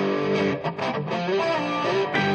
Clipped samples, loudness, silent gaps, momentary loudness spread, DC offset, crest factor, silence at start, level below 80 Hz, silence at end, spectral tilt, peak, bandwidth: under 0.1%; -24 LUFS; none; 4 LU; under 0.1%; 14 dB; 0 s; -66 dBFS; 0 s; -6 dB/octave; -10 dBFS; 8.6 kHz